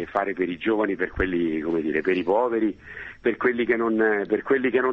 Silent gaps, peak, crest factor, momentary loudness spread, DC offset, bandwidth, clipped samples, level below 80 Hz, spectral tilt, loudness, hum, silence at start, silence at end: none; -6 dBFS; 18 dB; 5 LU; under 0.1%; 5.8 kHz; under 0.1%; -48 dBFS; -8 dB/octave; -24 LUFS; none; 0 s; 0 s